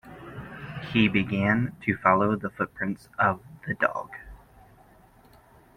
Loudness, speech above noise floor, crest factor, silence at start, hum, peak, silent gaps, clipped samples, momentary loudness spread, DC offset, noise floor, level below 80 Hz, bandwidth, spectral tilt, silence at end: -26 LUFS; 30 dB; 22 dB; 0.05 s; none; -6 dBFS; none; under 0.1%; 18 LU; under 0.1%; -56 dBFS; -56 dBFS; 13 kHz; -7.5 dB/octave; 1.4 s